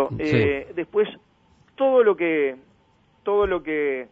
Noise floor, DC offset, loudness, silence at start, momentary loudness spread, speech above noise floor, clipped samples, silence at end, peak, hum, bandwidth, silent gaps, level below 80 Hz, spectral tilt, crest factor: -60 dBFS; under 0.1%; -22 LUFS; 0 s; 9 LU; 39 dB; under 0.1%; 0.05 s; -8 dBFS; none; 6.6 kHz; none; -50 dBFS; -8 dB/octave; 16 dB